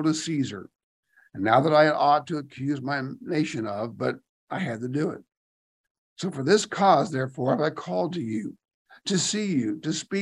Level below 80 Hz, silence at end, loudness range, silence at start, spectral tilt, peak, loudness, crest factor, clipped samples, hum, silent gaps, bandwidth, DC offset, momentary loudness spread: -72 dBFS; 0 s; 6 LU; 0 s; -5 dB/octave; -4 dBFS; -25 LUFS; 22 dB; under 0.1%; none; 0.83-1.03 s, 4.29-4.47 s, 5.37-5.84 s, 5.90-6.16 s, 8.74-8.85 s; 11.5 kHz; under 0.1%; 13 LU